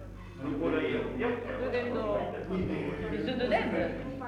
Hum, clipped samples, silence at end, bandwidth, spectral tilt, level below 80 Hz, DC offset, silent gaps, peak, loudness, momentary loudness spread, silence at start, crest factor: none; under 0.1%; 0 s; 11.5 kHz; -7.5 dB/octave; -48 dBFS; under 0.1%; none; -16 dBFS; -32 LUFS; 6 LU; 0 s; 16 dB